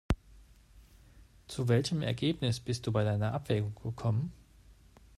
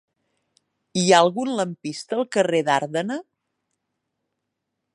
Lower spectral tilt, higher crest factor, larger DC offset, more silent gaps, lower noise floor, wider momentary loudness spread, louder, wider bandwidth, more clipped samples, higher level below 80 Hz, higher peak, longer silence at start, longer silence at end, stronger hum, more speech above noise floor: first, -6.5 dB/octave vs -4 dB/octave; about the same, 20 dB vs 22 dB; neither; neither; second, -59 dBFS vs -80 dBFS; second, 7 LU vs 13 LU; second, -33 LUFS vs -21 LUFS; about the same, 12.5 kHz vs 11.5 kHz; neither; first, -50 dBFS vs -74 dBFS; second, -14 dBFS vs -2 dBFS; second, 0.1 s vs 0.95 s; second, 0.45 s vs 1.7 s; neither; second, 27 dB vs 59 dB